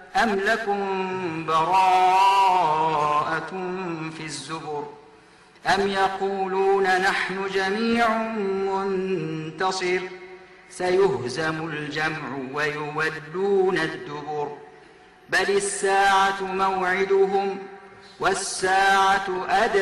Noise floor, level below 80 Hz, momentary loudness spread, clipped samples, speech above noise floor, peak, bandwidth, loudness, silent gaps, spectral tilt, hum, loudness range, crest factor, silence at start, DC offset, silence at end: -52 dBFS; -58 dBFS; 13 LU; under 0.1%; 29 dB; -10 dBFS; 12.5 kHz; -23 LUFS; none; -4 dB/octave; none; 5 LU; 12 dB; 0 s; under 0.1%; 0 s